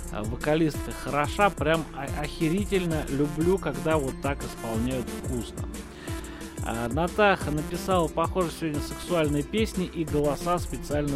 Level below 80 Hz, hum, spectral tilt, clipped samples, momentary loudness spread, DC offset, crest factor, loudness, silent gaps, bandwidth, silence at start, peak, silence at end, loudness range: -40 dBFS; none; -5.5 dB/octave; under 0.1%; 10 LU; under 0.1%; 20 dB; -27 LUFS; none; 16 kHz; 0 s; -6 dBFS; 0 s; 3 LU